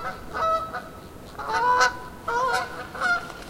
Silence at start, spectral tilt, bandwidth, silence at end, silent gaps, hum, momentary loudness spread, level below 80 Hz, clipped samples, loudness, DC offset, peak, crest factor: 0 s; -2.5 dB/octave; 16 kHz; 0 s; none; none; 16 LU; -50 dBFS; under 0.1%; -25 LUFS; under 0.1%; -4 dBFS; 22 dB